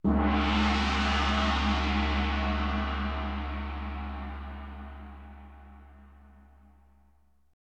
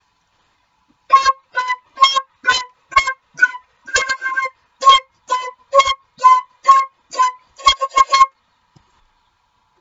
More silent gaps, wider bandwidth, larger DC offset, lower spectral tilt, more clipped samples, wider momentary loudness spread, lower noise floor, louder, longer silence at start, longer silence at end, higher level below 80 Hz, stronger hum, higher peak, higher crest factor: neither; about the same, 8.4 kHz vs 8 kHz; neither; first, -6 dB/octave vs 1 dB/octave; neither; first, 20 LU vs 10 LU; first, -66 dBFS vs -62 dBFS; second, -29 LUFS vs -15 LUFS; second, 0.05 s vs 1.1 s; about the same, 1.5 s vs 1.55 s; first, -34 dBFS vs -50 dBFS; neither; second, -12 dBFS vs 0 dBFS; about the same, 18 dB vs 18 dB